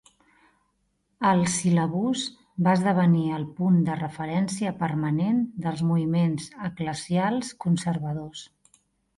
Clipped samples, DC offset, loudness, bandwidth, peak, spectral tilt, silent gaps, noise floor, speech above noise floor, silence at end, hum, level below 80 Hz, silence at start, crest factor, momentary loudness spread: under 0.1%; under 0.1%; -25 LUFS; 11.5 kHz; -10 dBFS; -6 dB/octave; none; -72 dBFS; 48 dB; 0.75 s; none; -62 dBFS; 1.2 s; 16 dB; 10 LU